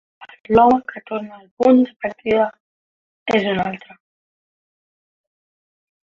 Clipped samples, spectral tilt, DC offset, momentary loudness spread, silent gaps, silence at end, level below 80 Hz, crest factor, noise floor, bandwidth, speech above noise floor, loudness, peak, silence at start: under 0.1%; -7 dB/octave; under 0.1%; 15 LU; 1.51-1.57 s, 2.60-3.26 s; 2.35 s; -52 dBFS; 18 dB; under -90 dBFS; 7.2 kHz; over 73 dB; -18 LUFS; -2 dBFS; 0.2 s